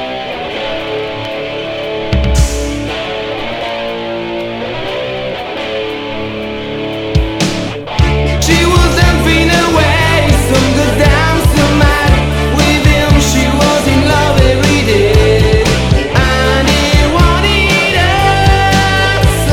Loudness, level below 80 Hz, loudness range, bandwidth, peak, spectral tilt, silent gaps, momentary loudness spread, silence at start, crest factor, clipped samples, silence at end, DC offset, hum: -11 LUFS; -18 dBFS; 9 LU; 17 kHz; 0 dBFS; -5 dB/octave; none; 10 LU; 0 s; 10 dB; 0.3%; 0 s; under 0.1%; none